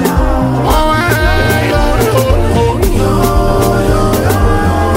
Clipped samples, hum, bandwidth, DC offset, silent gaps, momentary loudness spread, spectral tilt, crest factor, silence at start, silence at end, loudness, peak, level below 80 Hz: under 0.1%; none; 16.5 kHz; under 0.1%; none; 2 LU; -6 dB/octave; 10 dB; 0 s; 0 s; -11 LUFS; 0 dBFS; -16 dBFS